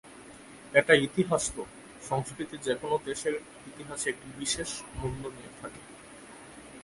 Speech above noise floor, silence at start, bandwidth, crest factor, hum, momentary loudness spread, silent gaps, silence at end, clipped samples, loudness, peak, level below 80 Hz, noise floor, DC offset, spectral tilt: 19 dB; 0.05 s; 11.5 kHz; 26 dB; none; 24 LU; none; 0 s; under 0.1%; -30 LUFS; -6 dBFS; -54 dBFS; -49 dBFS; under 0.1%; -3.5 dB/octave